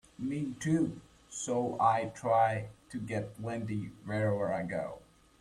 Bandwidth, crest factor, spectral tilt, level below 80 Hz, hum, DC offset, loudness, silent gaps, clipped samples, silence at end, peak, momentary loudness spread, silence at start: 12.5 kHz; 20 dB; -6 dB/octave; -64 dBFS; none; under 0.1%; -33 LUFS; none; under 0.1%; 0.4 s; -12 dBFS; 14 LU; 0.2 s